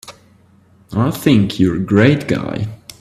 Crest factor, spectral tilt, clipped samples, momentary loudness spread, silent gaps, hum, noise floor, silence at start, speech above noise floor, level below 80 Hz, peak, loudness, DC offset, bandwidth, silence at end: 16 dB; -7 dB/octave; under 0.1%; 12 LU; none; none; -50 dBFS; 0.05 s; 36 dB; -46 dBFS; 0 dBFS; -15 LUFS; under 0.1%; 14.5 kHz; 0.1 s